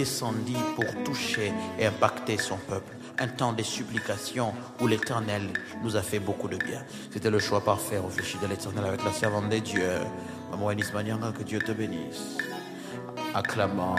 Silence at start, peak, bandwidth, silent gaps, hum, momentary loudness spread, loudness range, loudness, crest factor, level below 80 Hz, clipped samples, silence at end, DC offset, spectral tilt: 0 s; -6 dBFS; 15 kHz; none; none; 9 LU; 3 LU; -30 LUFS; 22 dB; -62 dBFS; under 0.1%; 0 s; under 0.1%; -4.5 dB/octave